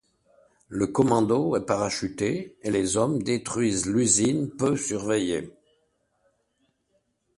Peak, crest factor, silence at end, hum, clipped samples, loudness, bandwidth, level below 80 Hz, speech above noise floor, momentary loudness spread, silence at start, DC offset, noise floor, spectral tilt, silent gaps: -8 dBFS; 20 dB; 1.85 s; none; under 0.1%; -25 LUFS; 11.5 kHz; -56 dBFS; 47 dB; 8 LU; 0.7 s; under 0.1%; -72 dBFS; -4.5 dB/octave; none